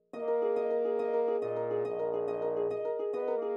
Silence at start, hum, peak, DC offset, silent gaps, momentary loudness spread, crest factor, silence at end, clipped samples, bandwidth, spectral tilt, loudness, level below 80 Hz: 0.15 s; none; -20 dBFS; under 0.1%; none; 3 LU; 12 dB; 0 s; under 0.1%; 5.4 kHz; -8 dB/octave; -32 LUFS; -82 dBFS